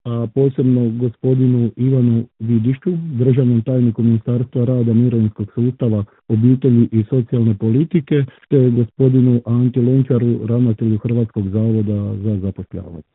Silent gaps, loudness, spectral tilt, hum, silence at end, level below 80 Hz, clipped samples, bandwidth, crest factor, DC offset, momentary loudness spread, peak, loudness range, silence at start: none; -16 LUFS; -14.5 dB/octave; none; 0.15 s; -54 dBFS; under 0.1%; 3.9 kHz; 14 dB; under 0.1%; 7 LU; -2 dBFS; 1 LU; 0.05 s